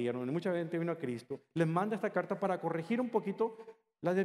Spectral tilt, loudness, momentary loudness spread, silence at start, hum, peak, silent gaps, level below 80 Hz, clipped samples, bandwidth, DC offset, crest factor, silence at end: -8 dB/octave; -35 LUFS; 7 LU; 0 s; none; -16 dBFS; none; -84 dBFS; under 0.1%; 12.5 kHz; under 0.1%; 18 dB; 0 s